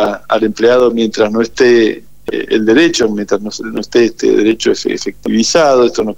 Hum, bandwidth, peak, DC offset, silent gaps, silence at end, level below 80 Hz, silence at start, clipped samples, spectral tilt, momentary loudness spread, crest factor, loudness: none; 10 kHz; 0 dBFS; 2%; none; 0.05 s; -46 dBFS; 0 s; under 0.1%; -4 dB/octave; 9 LU; 12 dB; -12 LUFS